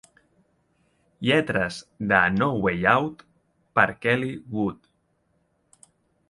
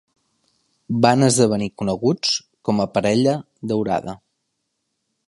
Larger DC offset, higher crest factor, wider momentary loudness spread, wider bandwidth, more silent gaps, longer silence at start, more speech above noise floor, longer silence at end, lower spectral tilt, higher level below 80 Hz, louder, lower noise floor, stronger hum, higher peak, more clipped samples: neither; about the same, 24 dB vs 20 dB; about the same, 10 LU vs 11 LU; about the same, 11.5 kHz vs 11.5 kHz; neither; first, 1.2 s vs 0.9 s; second, 46 dB vs 56 dB; first, 1.55 s vs 1.15 s; about the same, -6 dB/octave vs -5 dB/octave; about the same, -54 dBFS vs -56 dBFS; second, -23 LUFS vs -20 LUFS; second, -69 dBFS vs -75 dBFS; neither; about the same, -2 dBFS vs 0 dBFS; neither